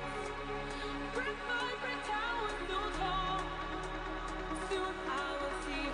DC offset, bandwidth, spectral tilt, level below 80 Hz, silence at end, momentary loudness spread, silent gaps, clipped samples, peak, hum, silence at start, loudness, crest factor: under 0.1%; 10.5 kHz; -4 dB/octave; -48 dBFS; 0 s; 5 LU; none; under 0.1%; -24 dBFS; none; 0 s; -37 LUFS; 14 dB